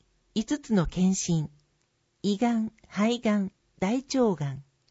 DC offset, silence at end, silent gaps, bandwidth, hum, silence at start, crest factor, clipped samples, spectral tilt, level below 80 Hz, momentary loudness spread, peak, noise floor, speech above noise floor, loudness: under 0.1%; 0.3 s; none; 8 kHz; none; 0.35 s; 18 dB; under 0.1%; -5.5 dB/octave; -50 dBFS; 9 LU; -10 dBFS; -72 dBFS; 46 dB; -28 LUFS